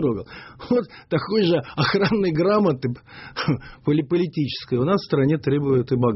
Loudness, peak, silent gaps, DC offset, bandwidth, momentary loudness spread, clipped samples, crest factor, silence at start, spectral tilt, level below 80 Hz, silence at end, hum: -22 LUFS; -6 dBFS; none; under 0.1%; 6 kHz; 9 LU; under 0.1%; 14 dB; 0 s; -6 dB/octave; -52 dBFS; 0 s; none